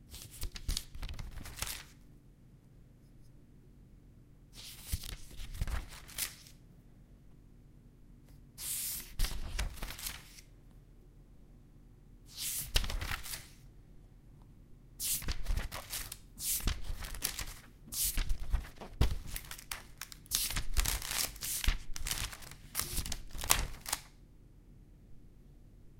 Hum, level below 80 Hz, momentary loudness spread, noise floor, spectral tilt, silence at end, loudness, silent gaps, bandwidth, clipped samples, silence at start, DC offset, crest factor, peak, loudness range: none; -42 dBFS; 20 LU; -59 dBFS; -2 dB/octave; 0.05 s; -38 LUFS; none; 17 kHz; under 0.1%; 0 s; under 0.1%; 36 dB; -2 dBFS; 11 LU